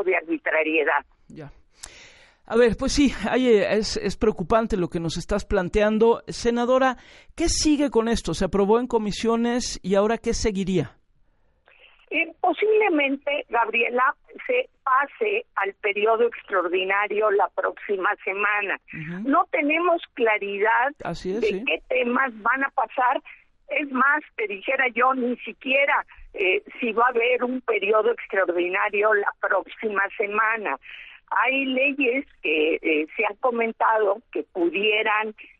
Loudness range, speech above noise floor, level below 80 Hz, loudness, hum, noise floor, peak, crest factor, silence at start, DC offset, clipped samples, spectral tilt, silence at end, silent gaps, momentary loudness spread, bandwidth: 2 LU; 39 dB; -44 dBFS; -23 LUFS; none; -61 dBFS; -6 dBFS; 16 dB; 0 s; under 0.1%; under 0.1%; -4.5 dB/octave; 0.15 s; none; 7 LU; 11.5 kHz